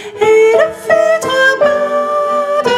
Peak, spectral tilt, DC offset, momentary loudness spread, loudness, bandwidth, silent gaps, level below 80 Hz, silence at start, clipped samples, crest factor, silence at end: 0 dBFS; -3 dB/octave; under 0.1%; 6 LU; -11 LUFS; 14.5 kHz; none; -56 dBFS; 0 s; under 0.1%; 10 dB; 0 s